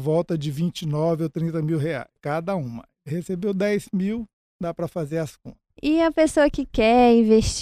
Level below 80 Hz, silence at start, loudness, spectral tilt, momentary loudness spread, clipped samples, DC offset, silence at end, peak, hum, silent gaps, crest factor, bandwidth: -42 dBFS; 0 s; -23 LUFS; -6 dB/octave; 15 LU; under 0.1%; under 0.1%; 0 s; -4 dBFS; none; 4.33-4.59 s; 18 dB; 14.5 kHz